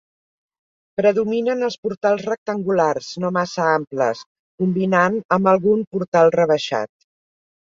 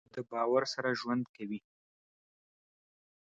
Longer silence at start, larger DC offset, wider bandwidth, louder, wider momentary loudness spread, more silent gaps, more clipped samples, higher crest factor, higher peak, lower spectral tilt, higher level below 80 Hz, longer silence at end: first, 1 s vs 0.15 s; neither; about the same, 7.6 kHz vs 8 kHz; first, -19 LUFS vs -34 LUFS; second, 8 LU vs 12 LU; first, 1.78-1.83 s, 1.97-2.01 s, 2.38-2.46 s, 4.26-4.58 s, 5.25-5.29 s, 5.87-5.91 s, 6.08-6.12 s vs 1.29-1.34 s; neither; about the same, 18 dB vs 20 dB; first, -2 dBFS vs -16 dBFS; about the same, -6 dB/octave vs -5 dB/octave; first, -62 dBFS vs -80 dBFS; second, 0.9 s vs 1.7 s